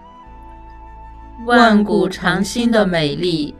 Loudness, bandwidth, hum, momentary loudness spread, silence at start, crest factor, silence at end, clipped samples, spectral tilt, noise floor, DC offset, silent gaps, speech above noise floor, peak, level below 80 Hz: -15 LUFS; 13.5 kHz; none; 7 LU; 0.2 s; 18 dB; 0.05 s; under 0.1%; -5.5 dB/octave; -38 dBFS; under 0.1%; none; 23 dB; 0 dBFS; -40 dBFS